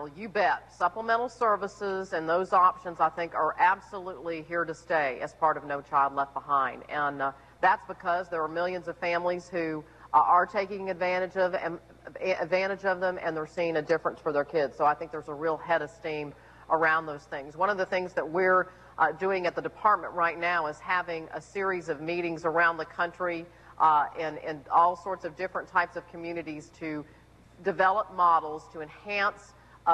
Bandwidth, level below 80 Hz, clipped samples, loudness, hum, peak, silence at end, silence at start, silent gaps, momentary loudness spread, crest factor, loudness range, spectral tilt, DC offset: 10 kHz; -62 dBFS; under 0.1%; -28 LUFS; none; -10 dBFS; 0 s; 0 s; none; 13 LU; 18 dB; 3 LU; -5.5 dB/octave; under 0.1%